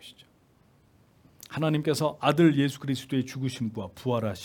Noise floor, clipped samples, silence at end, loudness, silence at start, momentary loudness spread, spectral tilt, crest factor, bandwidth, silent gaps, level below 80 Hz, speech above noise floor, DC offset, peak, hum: -62 dBFS; under 0.1%; 0 s; -27 LUFS; 0.05 s; 12 LU; -6.5 dB/octave; 20 dB; 18 kHz; none; -68 dBFS; 35 dB; under 0.1%; -8 dBFS; none